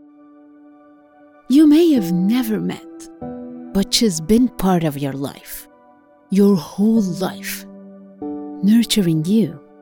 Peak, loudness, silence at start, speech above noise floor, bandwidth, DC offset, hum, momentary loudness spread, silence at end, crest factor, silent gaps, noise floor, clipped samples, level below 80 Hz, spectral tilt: -2 dBFS; -17 LUFS; 1.5 s; 34 dB; 18.5 kHz; under 0.1%; none; 19 LU; 0.25 s; 16 dB; none; -50 dBFS; under 0.1%; -44 dBFS; -5.5 dB/octave